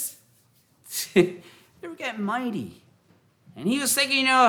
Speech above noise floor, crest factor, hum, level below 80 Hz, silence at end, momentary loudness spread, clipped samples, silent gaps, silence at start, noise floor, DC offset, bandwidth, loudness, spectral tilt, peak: 39 dB; 20 dB; none; -70 dBFS; 0 s; 21 LU; under 0.1%; none; 0 s; -62 dBFS; under 0.1%; over 20 kHz; -25 LUFS; -3 dB/octave; -6 dBFS